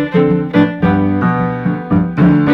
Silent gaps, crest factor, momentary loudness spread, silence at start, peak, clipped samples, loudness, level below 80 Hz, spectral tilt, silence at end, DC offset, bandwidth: none; 12 dB; 5 LU; 0 s; 0 dBFS; under 0.1%; -13 LUFS; -38 dBFS; -10 dB/octave; 0 s; under 0.1%; 5 kHz